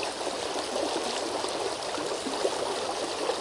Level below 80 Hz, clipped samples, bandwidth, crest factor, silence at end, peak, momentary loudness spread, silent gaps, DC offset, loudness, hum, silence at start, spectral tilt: -64 dBFS; under 0.1%; 11.5 kHz; 18 dB; 0 s; -14 dBFS; 2 LU; none; under 0.1%; -30 LUFS; none; 0 s; -2 dB/octave